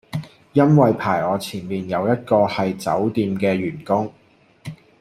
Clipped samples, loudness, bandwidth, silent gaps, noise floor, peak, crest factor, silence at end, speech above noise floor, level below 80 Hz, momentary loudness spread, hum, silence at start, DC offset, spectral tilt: under 0.1%; -20 LUFS; 15 kHz; none; -39 dBFS; -2 dBFS; 18 dB; 0.25 s; 20 dB; -58 dBFS; 16 LU; none; 0.15 s; under 0.1%; -7.5 dB/octave